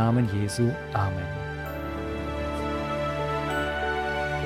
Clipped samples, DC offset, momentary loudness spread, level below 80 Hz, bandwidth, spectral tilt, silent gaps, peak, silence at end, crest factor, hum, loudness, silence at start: under 0.1%; under 0.1%; 7 LU; -40 dBFS; 15.5 kHz; -6.5 dB/octave; none; -12 dBFS; 0 s; 16 dB; none; -28 LUFS; 0 s